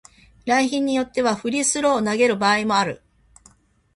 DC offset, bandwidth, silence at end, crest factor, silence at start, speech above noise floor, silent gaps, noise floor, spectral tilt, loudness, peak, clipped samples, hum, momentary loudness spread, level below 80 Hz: under 0.1%; 11.5 kHz; 1 s; 18 dB; 0.45 s; 36 dB; none; -55 dBFS; -3 dB/octave; -20 LUFS; -4 dBFS; under 0.1%; none; 5 LU; -58 dBFS